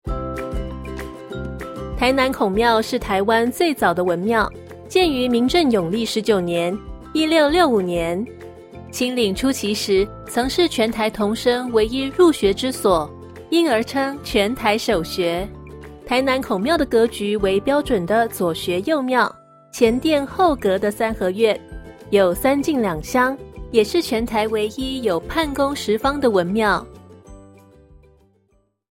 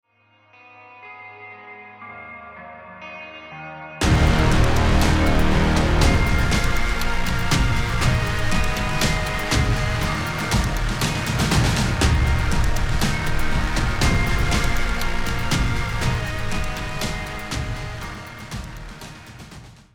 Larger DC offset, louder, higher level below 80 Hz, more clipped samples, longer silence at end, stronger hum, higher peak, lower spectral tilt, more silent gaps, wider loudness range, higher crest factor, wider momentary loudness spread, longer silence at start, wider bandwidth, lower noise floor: neither; about the same, -19 LUFS vs -21 LUFS; second, -40 dBFS vs -24 dBFS; neither; first, 1.5 s vs 0.25 s; neither; about the same, -2 dBFS vs -4 dBFS; about the same, -4.5 dB/octave vs -5 dB/octave; neither; second, 2 LU vs 10 LU; about the same, 18 dB vs 16 dB; second, 13 LU vs 20 LU; second, 0.05 s vs 0.9 s; about the same, 16.5 kHz vs 17 kHz; first, -63 dBFS vs -58 dBFS